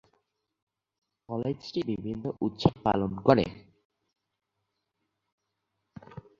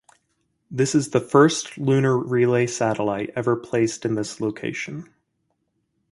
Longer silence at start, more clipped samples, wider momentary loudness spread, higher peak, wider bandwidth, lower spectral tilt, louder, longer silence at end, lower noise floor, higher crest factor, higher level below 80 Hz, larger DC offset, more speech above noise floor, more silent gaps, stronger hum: first, 1.3 s vs 0.7 s; neither; about the same, 12 LU vs 11 LU; about the same, -4 dBFS vs -2 dBFS; second, 7.6 kHz vs 11.5 kHz; first, -8 dB/octave vs -5.5 dB/octave; second, -29 LUFS vs -22 LUFS; second, 0.2 s vs 1.1 s; first, -83 dBFS vs -73 dBFS; first, 28 dB vs 22 dB; first, -56 dBFS vs -62 dBFS; neither; about the same, 55 dB vs 52 dB; first, 3.85-3.90 s, 5.32-5.38 s vs none; neither